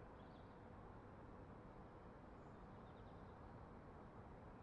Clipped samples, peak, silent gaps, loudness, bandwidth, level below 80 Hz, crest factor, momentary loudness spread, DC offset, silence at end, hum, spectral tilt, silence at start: under 0.1%; -46 dBFS; none; -60 LUFS; 6.8 kHz; -68 dBFS; 14 dB; 1 LU; under 0.1%; 0 s; none; -7 dB/octave; 0 s